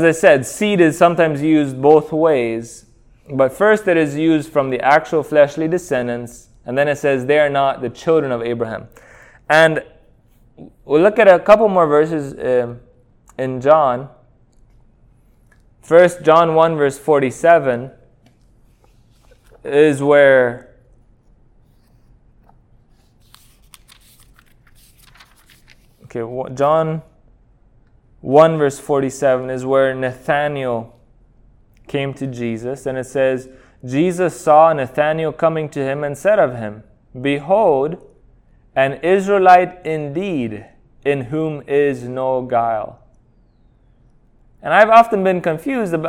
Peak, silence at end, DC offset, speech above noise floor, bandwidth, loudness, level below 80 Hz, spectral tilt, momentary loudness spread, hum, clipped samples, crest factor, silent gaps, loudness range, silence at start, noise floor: 0 dBFS; 0 s; under 0.1%; 38 dB; 16 kHz; -16 LUFS; -52 dBFS; -6 dB/octave; 14 LU; none; under 0.1%; 16 dB; none; 7 LU; 0 s; -53 dBFS